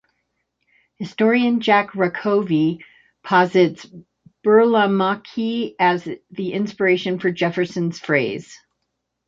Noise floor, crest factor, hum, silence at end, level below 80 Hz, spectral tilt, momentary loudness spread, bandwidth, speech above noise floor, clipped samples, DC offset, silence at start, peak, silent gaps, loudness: -76 dBFS; 18 dB; none; 0.7 s; -66 dBFS; -6.5 dB/octave; 12 LU; 7.6 kHz; 57 dB; under 0.1%; under 0.1%; 1 s; -2 dBFS; none; -19 LUFS